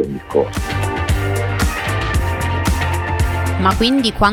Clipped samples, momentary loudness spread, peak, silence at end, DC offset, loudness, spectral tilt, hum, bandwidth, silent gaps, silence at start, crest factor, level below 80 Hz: under 0.1%; 5 LU; 0 dBFS; 0 s; under 0.1%; -18 LUFS; -5.5 dB/octave; none; 17.5 kHz; none; 0 s; 16 dB; -24 dBFS